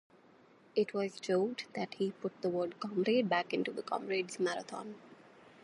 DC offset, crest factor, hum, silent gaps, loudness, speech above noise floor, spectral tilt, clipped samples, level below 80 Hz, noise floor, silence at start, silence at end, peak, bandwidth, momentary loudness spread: under 0.1%; 20 dB; none; none; -35 LUFS; 28 dB; -5 dB/octave; under 0.1%; -86 dBFS; -63 dBFS; 0.75 s; 0.4 s; -16 dBFS; 11.5 kHz; 10 LU